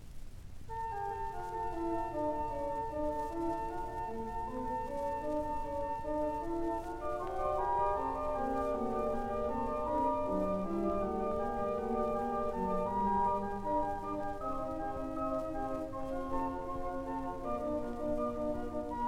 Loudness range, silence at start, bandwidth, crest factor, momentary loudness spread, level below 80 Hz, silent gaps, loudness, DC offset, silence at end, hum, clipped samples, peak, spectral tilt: 4 LU; 0 s; 15 kHz; 14 dB; 7 LU; -48 dBFS; none; -36 LUFS; under 0.1%; 0 s; none; under 0.1%; -20 dBFS; -7.5 dB/octave